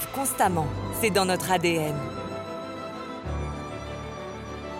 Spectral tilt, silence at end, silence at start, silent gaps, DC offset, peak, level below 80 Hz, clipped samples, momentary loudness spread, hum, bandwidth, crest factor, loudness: -4.5 dB/octave; 0 s; 0 s; none; under 0.1%; -10 dBFS; -44 dBFS; under 0.1%; 12 LU; none; 17 kHz; 18 dB; -28 LUFS